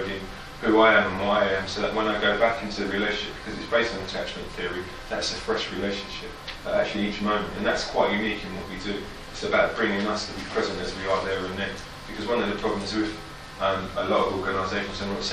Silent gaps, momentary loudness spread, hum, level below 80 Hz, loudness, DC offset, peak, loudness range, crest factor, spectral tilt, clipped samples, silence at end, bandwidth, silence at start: none; 11 LU; none; -46 dBFS; -26 LUFS; under 0.1%; -6 dBFS; 6 LU; 20 dB; -4.5 dB/octave; under 0.1%; 0 s; 14.5 kHz; 0 s